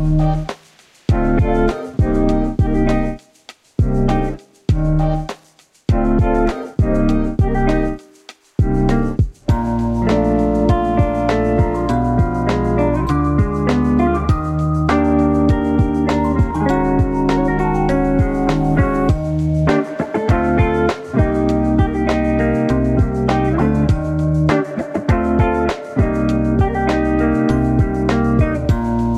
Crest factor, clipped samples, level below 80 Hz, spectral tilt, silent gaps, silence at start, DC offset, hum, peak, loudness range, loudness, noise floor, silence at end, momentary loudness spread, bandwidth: 16 dB; under 0.1%; -24 dBFS; -8.5 dB/octave; none; 0 s; under 0.1%; none; 0 dBFS; 3 LU; -17 LUFS; -51 dBFS; 0 s; 5 LU; 11.5 kHz